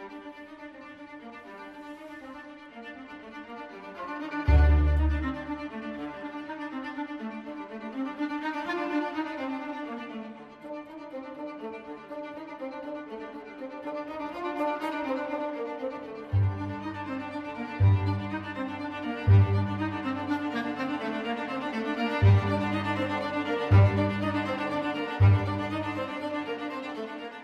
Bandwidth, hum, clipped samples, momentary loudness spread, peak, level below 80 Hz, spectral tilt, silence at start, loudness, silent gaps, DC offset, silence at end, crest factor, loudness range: 6.2 kHz; none; under 0.1%; 20 LU; -8 dBFS; -38 dBFS; -8.5 dB/octave; 0 s; -29 LUFS; none; under 0.1%; 0 s; 20 dB; 14 LU